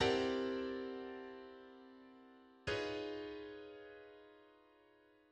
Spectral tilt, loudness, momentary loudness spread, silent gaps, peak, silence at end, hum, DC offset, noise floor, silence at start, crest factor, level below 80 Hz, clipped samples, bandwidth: -5 dB/octave; -43 LUFS; 22 LU; none; -22 dBFS; 0.75 s; none; under 0.1%; -69 dBFS; 0 s; 22 dB; -68 dBFS; under 0.1%; 9.6 kHz